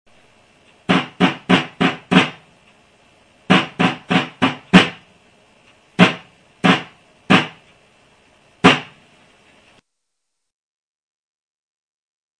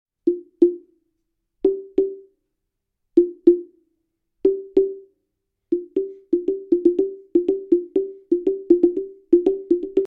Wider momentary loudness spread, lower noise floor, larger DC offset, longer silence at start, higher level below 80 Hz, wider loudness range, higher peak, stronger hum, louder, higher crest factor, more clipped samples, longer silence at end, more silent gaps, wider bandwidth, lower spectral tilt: about the same, 8 LU vs 9 LU; about the same, -78 dBFS vs -78 dBFS; neither; first, 0.9 s vs 0.25 s; about the same, -54 dBFS vs -56 dBFS; about the same, 5 LU vs 3 LU; about the same, 0 dBFS vs -2 dBFS; neither; first, -16 LUFS vs -21 LUFS; about the same, 20 dB vs 20 dB; neither; first, 3.55 s vs 0 s; neither; first, 10 kHz vs 3.4 kHz; second, -5.5 dB/octave vs -9.5 dB/octave